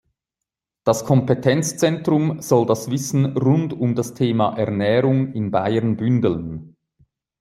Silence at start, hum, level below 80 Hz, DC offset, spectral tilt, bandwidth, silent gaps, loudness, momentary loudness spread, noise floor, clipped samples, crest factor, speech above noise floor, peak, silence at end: 0.85 s; none; -56 dBFS; under 0.1%; -6.5 dB/octave; 15.5 kHz; none; -20 LUFS; 4 LU; -85 dBFS; under 0.1%; 18 dB; 66 dB; -2 dBFS; 0.7 s